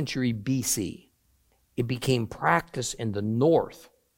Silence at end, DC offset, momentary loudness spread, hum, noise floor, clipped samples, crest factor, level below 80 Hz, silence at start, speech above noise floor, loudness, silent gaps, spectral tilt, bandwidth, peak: 0.35 s; under 0.1%; 12 LU; none; -67 dBFS; under 0.1%; 20 dB; -56 dBFS; 0 s; 40 dB; -27 LUFS; none; -5 dB/octave; 17 kHz; -6 dBFS